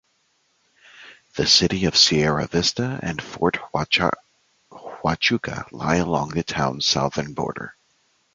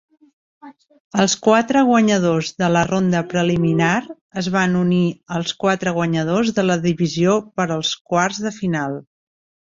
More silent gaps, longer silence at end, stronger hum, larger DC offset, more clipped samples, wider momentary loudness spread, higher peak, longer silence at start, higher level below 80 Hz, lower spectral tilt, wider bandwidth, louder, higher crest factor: second, none vs 1.00-1.11 s, 4.21-4.29 s, 8.01-8.05 s; about the same, 0.65 s vs 0.7 s; neither; neither; neither; first, 15 LU vs 9 LU; about the same, -2 dBFS vs -2 dBFS; first, 0.95 s vs 0.65 s; first, -46 dBFS vs -54 dBFS; second, -3.5 dB/octave vs -5.5 dB/octave; first, 9.4 kHz vs 7.8 kHz; second, -21 LUFS vs -18 LUFS; about the same, 22 dB vs 18 dB